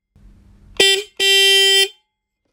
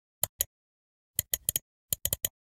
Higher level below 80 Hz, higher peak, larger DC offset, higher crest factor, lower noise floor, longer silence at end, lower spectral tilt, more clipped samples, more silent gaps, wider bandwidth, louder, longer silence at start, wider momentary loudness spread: about the same, -52 dBFS vs -54 dBFS; first, 0 dBFS vs -6 dBFS; neither; second, 16 dB vs 30 dB; second, -73 dBFS vs under -90 dBFS; first, 0.65 s vs 0.3 s; second, 1 dB/octave vs -0.5 dB/octave; neither; second, none vs 0.29-0.39 s, 0.46-1.14 s, 1.62-1.89 s; about the same, 16 kHz vs 17 kHz; first, -12 LUFS vs -31 LUFS; first, 0.8 s vs 0.25 s; about the same, 6 LU vs 5 LU